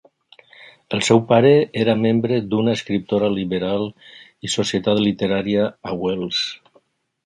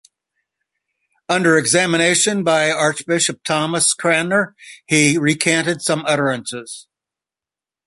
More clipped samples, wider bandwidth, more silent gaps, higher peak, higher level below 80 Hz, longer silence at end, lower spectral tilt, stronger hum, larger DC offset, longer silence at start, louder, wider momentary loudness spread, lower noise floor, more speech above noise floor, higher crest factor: neither; about the same, 11 kHz vs 11.5 kHz; neither; about the same, 0 dBFS vs 0 dBFS; first, -54 dBFS vs -62 dBFS; second, 0.7 s vs 1.05 s; first, -5.5 dB/octave vs -3 dB/octave; neither; neither; second, 0.6 s vs 1.3 s; second, -19 LUFS vs -16 LUFS; about the same, 10 LU vs 9 LU; second, -59 dBFS vs -89 dBFS; second, 40 dB vs 72 dB; about the same, 20 dB vs 18 dB